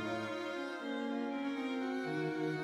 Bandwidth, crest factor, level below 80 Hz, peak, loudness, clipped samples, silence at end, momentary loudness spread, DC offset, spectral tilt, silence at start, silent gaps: 12.5 kHz; 12 dB; -80 dBFS; -26 dBFS; -39 LUFS; under 0.1%; 0 s; 3 LU; under 0.1%; -6 dB/octave; 0 s; none